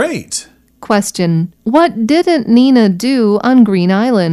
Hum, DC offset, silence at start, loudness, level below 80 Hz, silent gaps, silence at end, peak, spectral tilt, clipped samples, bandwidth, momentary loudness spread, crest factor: none; under 0.1%; 0 s; -12 LUFS; -54 dBFS; none; 0 s; 0 dBFS; -6 dB/octave; under 0.1%; 13.5 kHz; 7 LU; 12 dB